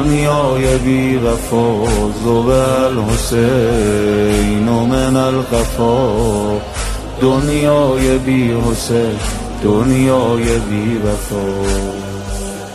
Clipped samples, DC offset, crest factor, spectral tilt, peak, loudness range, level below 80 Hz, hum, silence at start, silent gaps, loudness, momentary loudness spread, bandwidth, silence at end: under 0.1%; under 0.1%; 12 dB; -6 dB/octave; 0 dBFS; 2 LU; -24 dBFS; none; 0 s; none; -15 LUFS; 7 LU; 13.5 kHz; 0 s